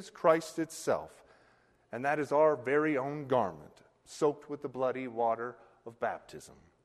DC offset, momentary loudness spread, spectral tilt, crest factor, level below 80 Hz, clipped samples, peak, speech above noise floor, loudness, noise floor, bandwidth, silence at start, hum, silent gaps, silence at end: under 0.1%; 23 LU; -5.5 dB/octave; 22 dB; -72 dBFS; under 0.1%; -12 dBFS; 35 dB; -32 LUFS; -67 dBFS; 13 kHz; 0 s; none; none; 0.35 s